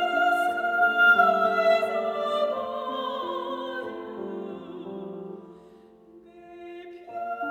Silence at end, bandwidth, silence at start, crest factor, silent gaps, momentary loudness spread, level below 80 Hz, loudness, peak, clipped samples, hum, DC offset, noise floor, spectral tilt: 0 s; 18 kHz; 0 s; 18 dB; none; 22 LU; -72 dBFS; -24 LUFS; -8 dBFS; under 0.1%; none; under 0.1%; -52 dBFS; -4.5 dB/octave